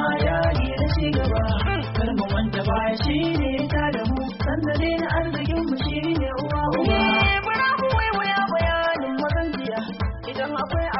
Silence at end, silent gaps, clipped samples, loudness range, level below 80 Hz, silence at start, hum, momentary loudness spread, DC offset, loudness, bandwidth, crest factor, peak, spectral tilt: 0 s; none; under 0.1%; 3 LU; -30 dBFS; 0 s; none; 6 LU; under 0.1%; -23 LUFS; 5.8 kHz; 14 dB; -8 dBFS; -4.5 dB/octave